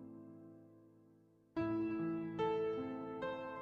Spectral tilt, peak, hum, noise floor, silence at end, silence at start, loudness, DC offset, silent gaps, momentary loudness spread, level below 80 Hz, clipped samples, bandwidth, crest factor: -8.5 dB/octave; -28 dBFS; none; -68 dBFS; 0 s; 0 s; -41 LUFS; under 0.1%; none; 19 LU; -72 dBFS; under 0.1%; 6.2 kHz; 16 dB